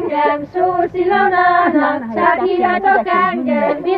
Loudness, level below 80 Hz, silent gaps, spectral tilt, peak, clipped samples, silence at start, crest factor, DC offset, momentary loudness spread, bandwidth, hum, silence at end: -14 LUFS; -52 dBFS; none; -8 dB/octave; 0 dBFS; under 0.1%; 0 s; 14 dB; under 0.1%; 5 LU; 5.2 kHz; none; 0 s